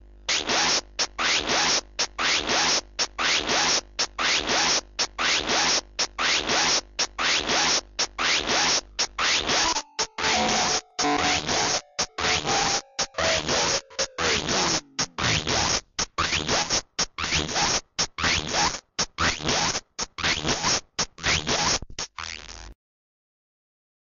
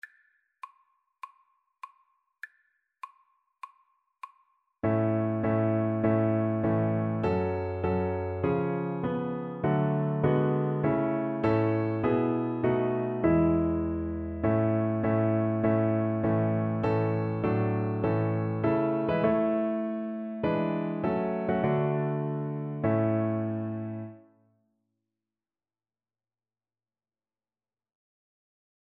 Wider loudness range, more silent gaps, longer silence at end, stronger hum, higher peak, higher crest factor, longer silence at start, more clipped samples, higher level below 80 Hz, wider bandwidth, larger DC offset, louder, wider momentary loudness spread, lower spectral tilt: second, 2 LU vs 6 LU; neither; second, 1.3 s vs 4.7 s; neither; about the same, -12 dBFS vs -12 dBFS; about the same, 14 dB vs 16 dB; about the same, 0.15 s vs 0.05 s; neither; first, -46 dBFS vs -54 dBFS; first, 9 kHz vs 4.3 kHz; neither; first, -23 LUFS vs -28 LUFS; second, 7 LU vs 13 LU; second, -1 dB/octave vs -11 dB/octave